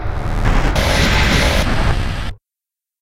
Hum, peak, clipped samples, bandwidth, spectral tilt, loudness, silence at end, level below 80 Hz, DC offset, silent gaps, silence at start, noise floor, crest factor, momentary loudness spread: none; -2 dBFS; under 0.1%; 16.5 kHz; -4.5 dB/octave; -16 LUFS; 0.65 s; -18 dBFS; under 0.1%; none; 0 s; -87 dBFS; 14 dB; 10 LU